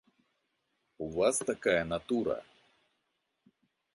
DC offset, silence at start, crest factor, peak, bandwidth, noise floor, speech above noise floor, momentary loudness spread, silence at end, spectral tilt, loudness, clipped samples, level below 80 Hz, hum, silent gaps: under 0.1%; 1 s; 22 dB; -14 dBFS; 11.5 kHz; -81 dBFS; 50 dB; 10 LU; 1.5 s; -4 dB/octave; -32 LUFS; under 0.1%; -62 dBFS; none; none